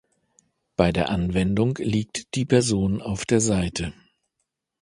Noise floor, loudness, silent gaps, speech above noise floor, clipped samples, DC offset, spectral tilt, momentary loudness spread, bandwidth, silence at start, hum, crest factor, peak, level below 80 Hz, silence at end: -79 dBFS; -23 LUFS; none; 56 dB; under 0.1%; under 0.1%; -5.5 dB/octave; 8 LU; 11.5 kHz; 0.8 s; none; 22 dB; -2 dBFS; -42 dBFS; 0.9 s